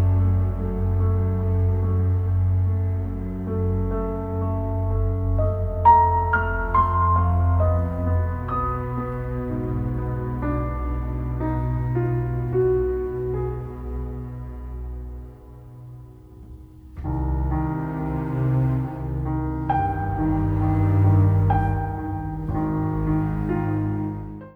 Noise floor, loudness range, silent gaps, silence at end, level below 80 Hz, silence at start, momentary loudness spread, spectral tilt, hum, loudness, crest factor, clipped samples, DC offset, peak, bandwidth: -43 dBFS; 10 LU; none; 0.05 s; -32 dBFS; 0 s; 13 LU; -11 dB/octave; none; -23 LUFS; 18 dB; under 0.1%; under 0.1%; -4 dBFS; 3.4 kHz